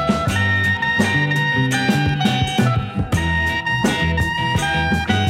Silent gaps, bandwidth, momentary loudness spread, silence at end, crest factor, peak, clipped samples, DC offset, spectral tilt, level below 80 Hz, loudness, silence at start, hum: none; 16 kHz; 3 LU; 0 s; 16 dB; -2 dBFS; under 0.1%; under 0.1%; -5 dB/octave; -34 dBFS; -18 LUFS; 0 s; none